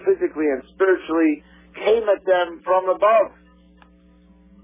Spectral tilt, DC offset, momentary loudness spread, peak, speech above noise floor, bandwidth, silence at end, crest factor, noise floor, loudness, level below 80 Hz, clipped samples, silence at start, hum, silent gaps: -8.5 dB/octave; under 0.1%; 7 LU; -6 dBFS; 33 dB; 3.7 kHz; 1.35 s; 16 dB; -52 dBFS; -20 LUFS; -56 dBFS; under 0.1%; 0 s; none; none